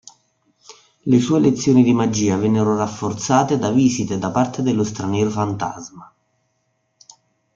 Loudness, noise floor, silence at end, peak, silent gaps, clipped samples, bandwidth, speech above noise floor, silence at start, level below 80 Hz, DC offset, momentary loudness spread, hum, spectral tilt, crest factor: -18 LUFS; -69 dBFS; 1.5 s; -2 dBFS; none; under 0.1%; 7.6 kHz; 51 dB; 0.7 s; -56 dBFS; under 0.1%; 10 LU; none; -6 dB/octave; 16 dB